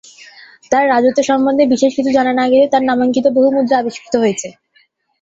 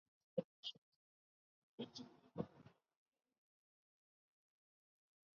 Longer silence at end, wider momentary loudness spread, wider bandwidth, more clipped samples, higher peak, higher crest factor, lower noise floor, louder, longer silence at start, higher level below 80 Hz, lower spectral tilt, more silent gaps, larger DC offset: second, 0.7 s vs 2.65 s; second, 6 LU vs 19 LU; first, 7.8 kHz vs 6.6 kHz; neither; first, -2 dBFS vs -28 dBFS; second, 12 dB vs 30 dB; second, -56 dBFS vs -68 dBFS; first, -13 LUFS vs -52 LUFS; first, 0.7 s vs 0.35 s; first, -58 dBFS vs -86 dBFS; about the same, -4.5 dB/octave vs -5 dB/octave; second, none vs 0.45-0.63 s, 0.78-1.78 s; neither